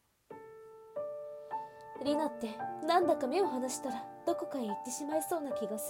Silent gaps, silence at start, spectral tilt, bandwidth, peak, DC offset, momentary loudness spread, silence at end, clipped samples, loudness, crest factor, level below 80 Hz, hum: none; 0.3 s; -3.5 dB/octave; 17.5 kHz; -16 dBFS; under 0.1%; 19 LU; 0 s; under 0.1%; -35 LUFS; 20 dB; -78 dBFS; none